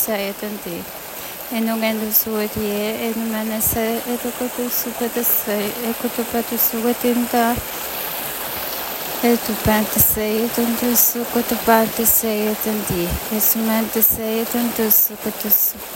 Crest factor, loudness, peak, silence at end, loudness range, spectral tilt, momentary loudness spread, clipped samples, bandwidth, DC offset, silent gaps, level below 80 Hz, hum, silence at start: 20 dB; -18 LUFS; 0 dBFS; 0 s; 4 LU; -3.5 dB/octave; 10 LU; under 0.1%; 17 kHz; under 0.1%; none; -42 dBFS; none; 0 s